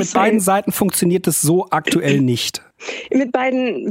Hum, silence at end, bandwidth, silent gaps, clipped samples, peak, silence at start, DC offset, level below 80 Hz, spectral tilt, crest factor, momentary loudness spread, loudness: none; 0 s; 16 kHz; none; under 0.1%; -2 dBFS; 0 s; under 0.1%; -58 dBFS; -4.5 dB/octave; 16 dB; 7 LU; -17 LUFS